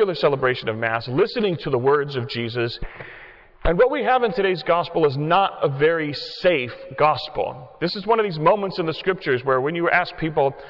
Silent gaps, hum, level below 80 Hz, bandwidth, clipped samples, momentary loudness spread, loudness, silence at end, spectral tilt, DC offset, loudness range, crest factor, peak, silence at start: none; none; -42 dBFS; 6 kHz; under 0.1%; 8 LU; -21 LUFS; 0 s; -7.5 dB/octave; under 0.1%; 2 LU; 16 dB; -6 dBFS; 0 s